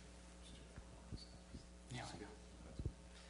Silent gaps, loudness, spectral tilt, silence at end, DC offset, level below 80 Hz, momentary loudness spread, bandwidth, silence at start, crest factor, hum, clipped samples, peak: none; -55 LUFS; -5 dB/octave; 0 s; under 0.1%; -58 dBFS; 8 LU; 10.5 kHz; 0 s; 22 dB; none; under 0.1%; -32 dBFS